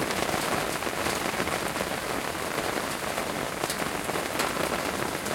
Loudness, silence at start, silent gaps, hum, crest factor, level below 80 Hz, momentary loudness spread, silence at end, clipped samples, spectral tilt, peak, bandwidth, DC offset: -29 LUFS; 0 s; none; none; 22 dB; -52 dBFS; 3 LU; 0 s; under 0.1%; -3 dB/octave; -8 dBFS; 17 kHz; under 0.1%